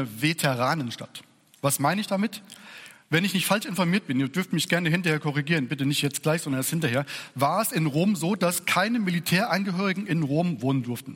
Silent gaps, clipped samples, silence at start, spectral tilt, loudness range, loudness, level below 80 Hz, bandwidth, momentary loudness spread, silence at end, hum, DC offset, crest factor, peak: none; under 0.1%; 0 s; -4.5 dB/octave; 2 LU; -25 LUFS; -68 dBFS; 17 kHz; 7 LU; 0 s; none; under 0.1%; 18 dB; -8 dBFS